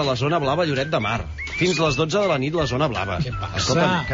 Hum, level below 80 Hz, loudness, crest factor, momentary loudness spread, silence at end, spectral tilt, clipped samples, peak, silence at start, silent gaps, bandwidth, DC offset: none; -40 dBFS; -22 LUFS; 14 dB; 6 LU; 0 s; -4 dB/octave; under 0.1%; -8 dBFS; 0 s; none; 7.6 kHz; under 0.1%